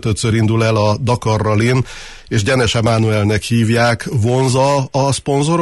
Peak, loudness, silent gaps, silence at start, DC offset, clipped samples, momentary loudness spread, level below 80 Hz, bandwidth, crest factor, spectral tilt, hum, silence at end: -2 dBFS; -15 LUFS; none; 0.05 s; under 0.1%; under 0.1%; 4 LU; -38 dBFS; 12 kHz; 12 dB; -5.5 dB/octave; none; 0 s